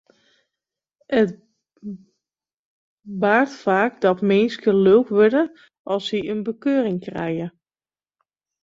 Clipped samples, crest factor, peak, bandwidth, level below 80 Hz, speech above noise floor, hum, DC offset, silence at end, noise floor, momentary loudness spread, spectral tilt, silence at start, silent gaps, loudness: under 0.1%; 18 dB; -2 dBFS; 7.6 kHz; -64 dBFS; over 71 dB; none; under 0.1%; 1.15 s; under -90 dBFS; 20 LU; -7 dB/octave; 1.1 s; 2.59-2.98 s, 5.79-5.85 s; -20 LUFS